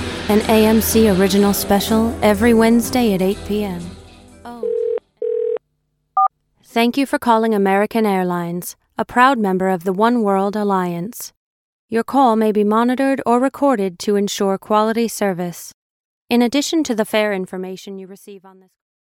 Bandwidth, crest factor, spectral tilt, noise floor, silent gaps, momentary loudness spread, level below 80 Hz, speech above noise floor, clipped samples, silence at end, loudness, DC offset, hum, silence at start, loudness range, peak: 17 kHz; 18 dB; -5 dB/octave; -69 dBFS; 11.37-11.88 s, 15.74-16.26 s; 14 LU; -44 dBFS; 52 dB; under 0.1%; 0.65 s; -17 LUFS; under 0.1%; none; 0 s; 6 LU; 0 dBFS